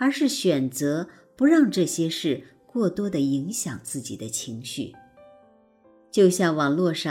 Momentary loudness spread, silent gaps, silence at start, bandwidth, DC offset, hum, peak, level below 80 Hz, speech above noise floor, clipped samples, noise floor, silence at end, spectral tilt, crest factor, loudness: 13 LU; none; 0 s; 16 kHz; under 0.1%; none; -6 dBFS; -66 dBFS; 34 dB; under 0.1%; -57 dBFS; 0 s; -5 dB/octave; 18 dB; -24 LUFS